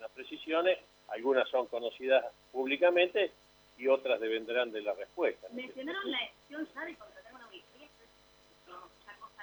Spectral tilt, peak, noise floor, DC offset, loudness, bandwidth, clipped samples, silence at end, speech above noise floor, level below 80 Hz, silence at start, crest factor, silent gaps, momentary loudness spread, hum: -4 dB/octave; -14 dBFS; -63 dBFS; under 0.1%; -33 LUFS; over 20 kHz; under 0.1%; 0 s; 31 dB; -76 dBFS; 0 s; 20 dB; none; 23 LU; none